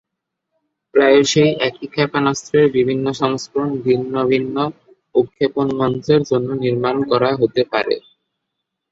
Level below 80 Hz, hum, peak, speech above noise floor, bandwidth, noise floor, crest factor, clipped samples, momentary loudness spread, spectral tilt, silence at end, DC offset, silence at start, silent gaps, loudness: -56 dBFS; none; -2 dBFS; 63 dB; 8 kHz; -79 dBFS; 16 dB; under 0.1%; 7 LU; -5.5 dB/octave; 0.9 s; under 0.1%; 0.95 s; none; -17 LUFS